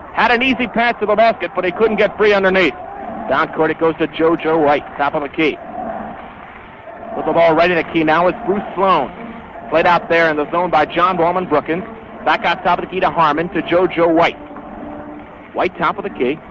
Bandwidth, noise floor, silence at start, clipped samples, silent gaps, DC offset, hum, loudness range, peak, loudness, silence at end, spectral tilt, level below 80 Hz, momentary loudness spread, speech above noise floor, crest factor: 7.4 kHz; -35 dBFS; 0 s; under 0.1%; none; under 0.1%; none; 3 LU; -2 dBFS; -16 LUFS; 0 s; -6.5 dB/octave; -46 dBFS; 18 LU; 20 dB; 14 dB